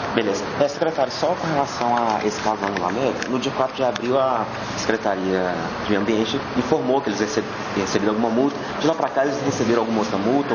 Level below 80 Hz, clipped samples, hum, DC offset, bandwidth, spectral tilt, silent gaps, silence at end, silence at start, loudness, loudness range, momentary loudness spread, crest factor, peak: -52 dBFS; under 0.1%; none; under 0.1%; 7.2 kHz; -5 dB/octave; none; 0 s; 0 s; -22 LUFS; 1 LU; 4 LU; 18 dB; -2 dBFS